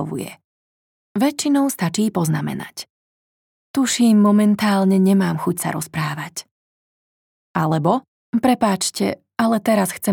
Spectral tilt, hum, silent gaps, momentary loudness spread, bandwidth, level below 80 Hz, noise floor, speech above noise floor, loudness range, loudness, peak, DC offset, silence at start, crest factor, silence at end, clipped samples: -5.5 dB/octave; none; 0.44-1.15 s, 2.90-3.74 s, 6.51-7.54 s, 8.08-8.33 s; 14 LU; 19 kHz; -64 dBFS; under -90 dBFS; over 72 dB; 5 LU; -19 LUFS; -4 dBFS; under 0.1%; 0 s; 16 dB; 0 s; under 0.1%